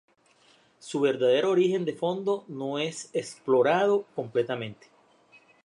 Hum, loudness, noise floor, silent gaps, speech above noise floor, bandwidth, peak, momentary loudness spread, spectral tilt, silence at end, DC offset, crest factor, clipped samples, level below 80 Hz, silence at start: none; -27 LUFS; -62 dBFS; none; 36 dB; 11 kHz; -10 dBFS; 11 LU; -5 dB/octave; 0.9 s; under 0.1%; 18 dB; under 0.1%; -78 dBFS; 0.85 s